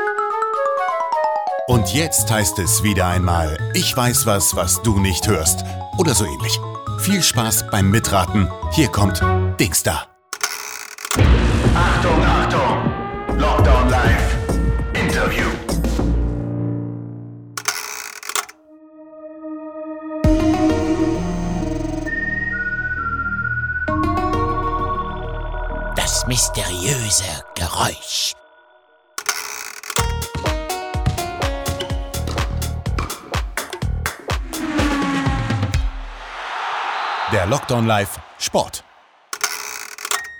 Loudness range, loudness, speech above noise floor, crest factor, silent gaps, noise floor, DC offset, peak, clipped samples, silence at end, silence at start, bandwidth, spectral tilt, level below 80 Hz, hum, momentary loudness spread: 7 LU; -19 LUFS; 36 dB; 18 dB; none; -53 dBFS; under 0.1%; -2 dBFS; under 0.1%; 0 s; 0 s; over 20 kHz; -4 dB/octave; -26 dBFS; none; 12 LU